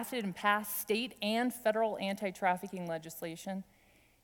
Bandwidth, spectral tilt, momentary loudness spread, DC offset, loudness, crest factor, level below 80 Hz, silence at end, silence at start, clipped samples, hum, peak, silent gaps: 19.5 kHz; -4 dB/octave; 11 LU; under 0.1%; -35 LUFS; 20 dB; -74 dBFS; 0.6 s; 0 s; under 0.1%; none; -14 dBFS; none